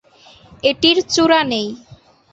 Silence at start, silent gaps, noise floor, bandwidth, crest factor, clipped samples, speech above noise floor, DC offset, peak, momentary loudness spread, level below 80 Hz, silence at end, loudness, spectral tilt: 0.65 s; none; -47 dBFS; 8.2 kHz; 18 dB; under 0.1%; 31 dB; under 0.1%; 0 dBFS; 12 LU; -52 dBFS; 0.4 s; -15 LUFS; -3 dB/octave